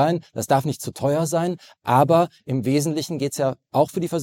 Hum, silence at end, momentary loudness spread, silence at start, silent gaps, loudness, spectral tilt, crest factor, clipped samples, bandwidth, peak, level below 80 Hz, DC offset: none; 0 s; 8 LU; 0 s; none; -22 LUFS; -6 dB/octave; 18 dB; under 0.1%; 17 kHz; -4 dBFS; -62 dBFS; under 0.1%